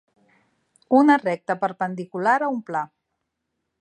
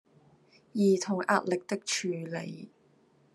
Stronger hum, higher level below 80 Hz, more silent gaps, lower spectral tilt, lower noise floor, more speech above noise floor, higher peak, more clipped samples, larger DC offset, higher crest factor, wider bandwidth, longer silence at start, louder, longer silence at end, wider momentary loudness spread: neither; first, -78 dBFS vs -84 dBFS; neither; first, -7 dB/octave vs -4.5 dB/octave; first, -79 dBFS vs -65 dBFS; first, 58 dB vs 35 dB; first, -4 dBFS vs -12 dBFS; neither; neither; about the same, 20 dB vs 20 dB; second, 9.2 kHz vs 12.5 kHz; first, 0.9 s vs 0.75 s; first, -22 LUFS vs -30 LUFS; first, 0.95 s vs 0.65 s; about the same, 13 LU vs 13 LU